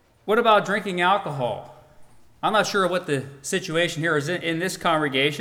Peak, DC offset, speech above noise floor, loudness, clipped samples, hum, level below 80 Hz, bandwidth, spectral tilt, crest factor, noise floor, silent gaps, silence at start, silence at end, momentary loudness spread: -6 dBFS; under 0.1%; 25 dB; -23 LUFS; under 0.1%; none; -62 dBFS; 18.5 kHz; -4 dB/octave; 18 dB; -48 dBFS; none; 0.25 s; 0 s; 9 LU